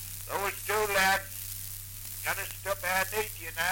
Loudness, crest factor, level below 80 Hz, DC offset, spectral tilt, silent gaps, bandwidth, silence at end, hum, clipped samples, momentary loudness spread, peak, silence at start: -30 LUFS; 18 dB; -52 dBFS; under 0.1%; -1.5 dB/octave; none; 17 kHz; 0 s; none; under 0.1%; 12 LU; -14 dBFS; 0 s